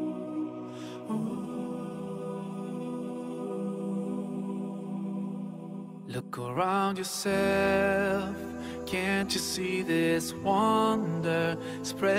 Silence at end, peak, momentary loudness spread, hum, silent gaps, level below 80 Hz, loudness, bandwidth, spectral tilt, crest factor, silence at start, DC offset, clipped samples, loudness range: 0 s; -14 dBFS; 12 LU; none; none; -60 dBFS; -31 LUFS; 16 kHz; -5 dB/octave; 18 dB; 0 s; under 0.1%; under 0.1%; 8 LU